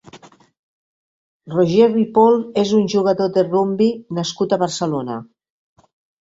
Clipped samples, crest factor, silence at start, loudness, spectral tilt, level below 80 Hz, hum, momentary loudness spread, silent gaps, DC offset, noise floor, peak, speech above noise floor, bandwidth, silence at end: under 0.1%; 16 dB; 0.15 s; -17 LUFS; -6 dB/octave; -60 dBFS; none; 10 LU; 0.59-1.40 s; under 0.1%; -45 dBFS; -2 dBFS; 29 dB; 7.8 kHz; 0.95 s